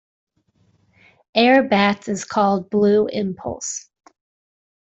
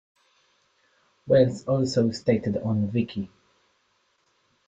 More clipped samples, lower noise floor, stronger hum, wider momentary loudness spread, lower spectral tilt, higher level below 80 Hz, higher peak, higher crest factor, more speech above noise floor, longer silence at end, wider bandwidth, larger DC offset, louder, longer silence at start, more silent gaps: neither; second, -62 dBFS vs -69 dBFS; neither; first, 13 LU vs 10 LU; second, -4.5 dB/octave vs -7 dB/octave; about the same, -60 dBFS vs -60 dBFS; about the same, -4 dBFS vs -6 dBFS; about the same, 18 dB vs 20 dB; about the same, 44 dB vs 46 dB; second, 1.1 s vs 1.4 s; about the same, 8.2 kHz vs 9 kHz; neither; first, -19 LUFS vs -24 LUFS; about the same, 1.35 s vs 1.25 s; neither